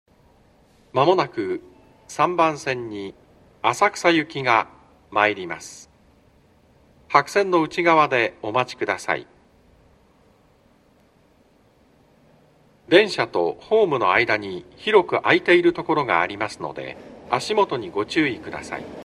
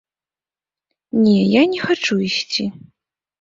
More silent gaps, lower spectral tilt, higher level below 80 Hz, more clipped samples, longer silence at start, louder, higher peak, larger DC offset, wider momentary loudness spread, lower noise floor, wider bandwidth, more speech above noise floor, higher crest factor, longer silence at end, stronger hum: neither; about the same, -4.5 dB/octave vs -5.5 dB/octave; about the same, -60 dBFS vs -60 dBFS; neither; second, 0.95 s vs 1.15 s; second, -21 LUFS vs -17 LUFS; about the same, 0 dBFS vs -2 dBFS; neither; first, 15 LU vs 9 LU; second, -58 dBFS vs under -90 dBFS; first, 12.5 kHz vs 7.6 kHz; second, 37 dB vs over 74 dB; about the same, 22 dB vs 18 dB; second, 0 s vs 0.7 s; neither